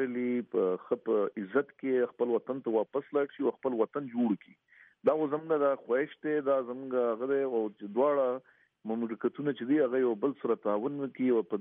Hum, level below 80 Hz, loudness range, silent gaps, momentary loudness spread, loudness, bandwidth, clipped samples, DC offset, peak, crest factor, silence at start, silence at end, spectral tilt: none; -86 dBFS; 1 LU; none; 5 LU; -31 LUFS; 3.8 kHz; under 0.1%; under 0.1%; -14 dBFS; 16 dB; 0 s; 0 s; -6 dB/octave